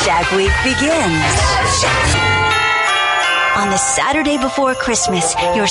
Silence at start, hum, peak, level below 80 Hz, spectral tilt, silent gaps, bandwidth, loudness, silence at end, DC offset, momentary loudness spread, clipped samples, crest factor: 0 s; none; -2 dBFS; -28 dBFS; -3 dB/octave; none; 11.5 kHz; -14 LUFS; 0 s; under 0.1%; 2 LU; under 0.1%; 12 dB